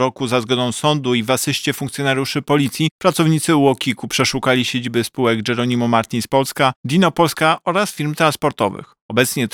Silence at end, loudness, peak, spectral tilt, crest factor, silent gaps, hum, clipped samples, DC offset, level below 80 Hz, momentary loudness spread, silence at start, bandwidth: 0.05 s; -17 LUFS; 0 dBFS; -4.5 dB/octave; 16 dB; 2.91-2.99 s, 6.76-6.84 s, 9.01-9.09 s; none; under 0.1%; under 0.1%; -56 dBFS; 5 LU; 0 s; 20 kHz